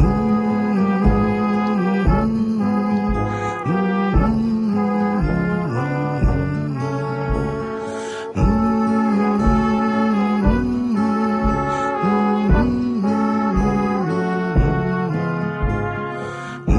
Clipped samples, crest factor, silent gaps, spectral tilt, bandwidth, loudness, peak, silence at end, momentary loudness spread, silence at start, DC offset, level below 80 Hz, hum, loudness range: under 0.1%; 14 dB; none; -8.5 dB/octave; 11 kHz; -19 LUFS; -4 dBFS; 0 s; 6 LU; 0 s; under 0.1%; -26 dBFS; none; 3 LU